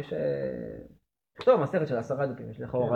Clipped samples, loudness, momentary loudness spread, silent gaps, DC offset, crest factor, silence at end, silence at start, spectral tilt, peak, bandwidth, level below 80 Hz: under 0.1%; -29 LUFS; 15 LU; none; under 0.1%; 20 dB; 0 s; 0 s; -8.5 dB/octave; -10 dBFS; 7 kHz; -60 dBFS